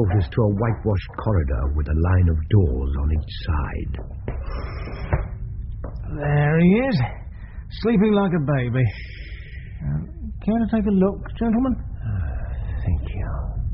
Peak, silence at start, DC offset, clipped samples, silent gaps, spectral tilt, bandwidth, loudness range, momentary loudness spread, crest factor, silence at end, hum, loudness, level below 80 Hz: -6 dBFS; 0 s; under 0.1%; under 0.1%; none; -8 dB/octave; 5.8 kHz; 5 LU; 14 LU; 16 dB; 0 s; none; -23 LUFS; -28 dBFS